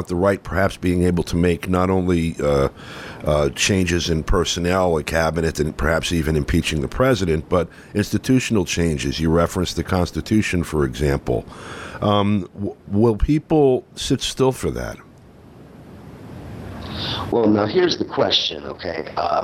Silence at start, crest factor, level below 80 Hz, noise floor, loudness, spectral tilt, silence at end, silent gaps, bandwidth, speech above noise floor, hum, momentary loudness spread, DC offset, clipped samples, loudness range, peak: 0 s; 16 dB; -34 dBFS; -45 dBFS; -20 LUFS; -5.5 dB/octave; 0 s; none; 16 kHz; 25 dB; none; 12 LU; under 0.1%; under 0.1%; 3 LU; -4 dBFS